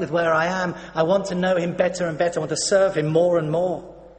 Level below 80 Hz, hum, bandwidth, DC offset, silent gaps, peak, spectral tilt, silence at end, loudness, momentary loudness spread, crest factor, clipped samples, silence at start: -54 dBFS; none; 8.8 kHz; under 0.1%; none; -6 dBFS; -5 dB/octave; 0.1 s; -21 LUFS; 6 LU; 14 dB; under 0.1%; 0 s